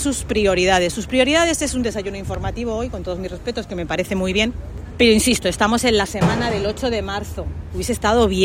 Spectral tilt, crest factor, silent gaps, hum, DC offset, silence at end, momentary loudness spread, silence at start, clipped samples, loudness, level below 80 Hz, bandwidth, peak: -4 dB/octave; 16 dB; none; none; under 0.1%; 0 s; 11 LU; 0 s; under 0.1%; -19 LUFS; -34 dBFS; 16 kHz; -2 dBFS